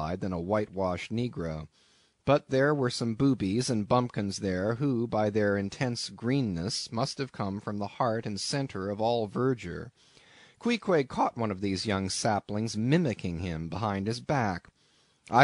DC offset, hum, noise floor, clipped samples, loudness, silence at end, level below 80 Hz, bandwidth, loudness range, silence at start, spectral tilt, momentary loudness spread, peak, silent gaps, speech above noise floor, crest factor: under 0.1%; none; -66 dBFS; under 0.1%; -30 LUFS; 0 s; -58 dBFS; 11 kHz; 3 LU; 0 s; -5.5 dB/octave; 8 LU; -8 dBFS; none; 37 dB; 22 dB